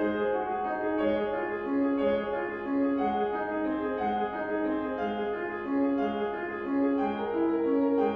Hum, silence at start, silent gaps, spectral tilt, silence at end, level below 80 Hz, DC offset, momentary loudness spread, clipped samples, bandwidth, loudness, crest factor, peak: none; 0 s; none; -8.5 dB/octave; 0 s; -60 dBFS; under 0.1%; 5 LU; under 0.1%; 4.9 kHz; -29 LUFS; 12 dB; -16 dBFS